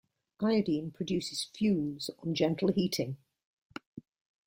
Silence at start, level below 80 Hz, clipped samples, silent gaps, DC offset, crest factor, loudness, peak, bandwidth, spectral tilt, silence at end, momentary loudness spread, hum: 0.4 s; -68 dBFS; under 0.1%; 3.45-3.70 s, 3.87-3.93 s; under 0.1%; 18 dB; -32 LUFS; -14 dBFS; 16.5 kHz; -5.5 dB/octave; 0.45 s; 18 LU; none